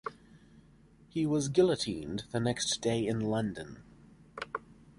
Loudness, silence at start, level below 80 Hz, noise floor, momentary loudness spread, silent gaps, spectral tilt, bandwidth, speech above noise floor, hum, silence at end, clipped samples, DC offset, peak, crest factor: -32 LUFS; 0.05 s; -60 dBFS; -60 dBFS; 17 LU; none; -5 dB/octave; 11.5 kHz; 29 dB; none; 0.25 s; under 0.1%; under 0.1%; -14 dBFS; 20 dB